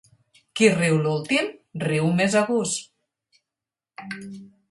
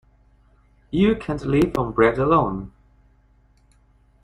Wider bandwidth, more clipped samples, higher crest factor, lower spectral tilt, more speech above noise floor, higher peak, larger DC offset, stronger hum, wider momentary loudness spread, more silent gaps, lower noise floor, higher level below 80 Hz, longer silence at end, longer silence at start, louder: about the same, 11.5 kHz vs 12 kHz; neither; about the same, 22 dB vs 20 dB; second, -5 dB/octave vs -8 dB/octave; first, 67 dB vs 38 dB; about the same, -2 dBFS vs -4 dBFS; neither; second, none vs 50 Hz at -45 dBFS; first, 17 LU vs 10 LU; neither; first, -89 dBFS vs -57 dBFS; second, -66 dBFS vs -42 dBFS; second, 0.25 s vs 1.55 s; second, 0.55 s vs 0.9 s; about the same, -22 LUFS vs -21 LUFS